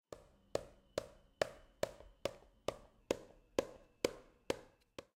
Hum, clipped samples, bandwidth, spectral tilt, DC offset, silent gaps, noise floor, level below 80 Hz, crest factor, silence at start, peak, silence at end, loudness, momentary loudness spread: none; under 0.1%; 16 kHz; -3.5 dB/octave; under 0.1%; none; -59 dBFS; -66 dBFS; 30 dB; 0.1 s; -16 dBFS; 0.15 s; -45 LUFS; 16 LU